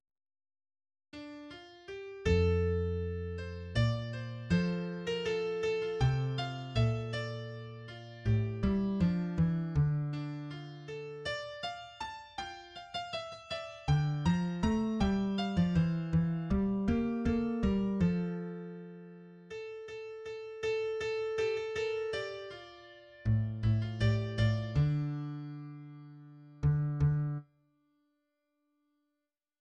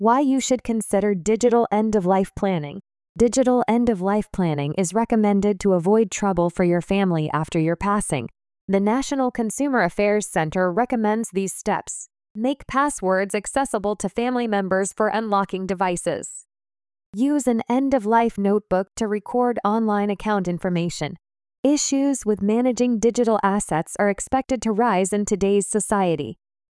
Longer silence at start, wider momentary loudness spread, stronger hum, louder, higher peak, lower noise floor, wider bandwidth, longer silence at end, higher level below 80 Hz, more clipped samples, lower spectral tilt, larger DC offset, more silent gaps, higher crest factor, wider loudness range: first, 1.15 s vs 0 s; first, 16 LU vs 7 LU; neither; second, -34 LUFS vs -21 LUFS; second, -18 dBFS vs -6 dBFS; about the same, -87 dBFS vs under -90 dBFS; second, 9.4 kHz vs 12 kHz; first, 2.15 s vs 0.4 s; about the same, -48 dBFS vs -48 dBFS; neither; first, -7.5 dB/octave vs -5.5 dB/octave; neither; second, none vs 3.09-3.15 s, 8.61-8.68 s, 12.30-12.35 s, 17.06-17.13 s, 21.58-21.63 s; about the same, 16 dB vs 14 dB; first, 6 LU vs 3 LU